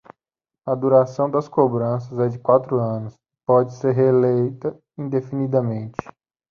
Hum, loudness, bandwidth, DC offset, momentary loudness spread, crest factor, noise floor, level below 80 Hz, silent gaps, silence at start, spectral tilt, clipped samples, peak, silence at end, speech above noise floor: none; -20 LUFS; 7 kHz; under 0.1%; 14 LU; 18 dB; -88 dBFS; -62 dBFS; none; 0.65 s; -10 dB/octave; under 0.1%; -2 dBFS; 0.4 s; 69 dB